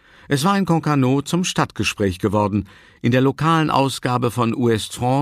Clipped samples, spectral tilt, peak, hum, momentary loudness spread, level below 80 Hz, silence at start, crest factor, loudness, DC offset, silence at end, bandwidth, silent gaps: under 0.1%; -5.5 dB/octave; -2 dBFS; none; 4 LU; -50 dBFS; 0.3 s; 16 dB; -19 LUFS; under 0.1%; 0 s; 15.5 kHz; none